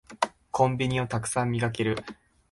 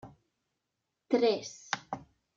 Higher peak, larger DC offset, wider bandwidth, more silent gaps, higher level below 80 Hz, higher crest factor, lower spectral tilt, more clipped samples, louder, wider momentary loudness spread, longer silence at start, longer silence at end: first, -8 dBFS vs -14 dBFS; neither; first, 11.5 kHz vs 7.6 kHz; neither; first, -56 dBFS vs -72 dBFS; about the same, 20 dB vs 22 dB; first, -5.5 dB/octave vs -3.5 dB/octave; neither; first, -28 LUFS vs -32 LUFS; second, 7 LU vs 16 LU; about the same, 0.1 s vs 0.05 s; about the same, 0.4 s vs 0.35 s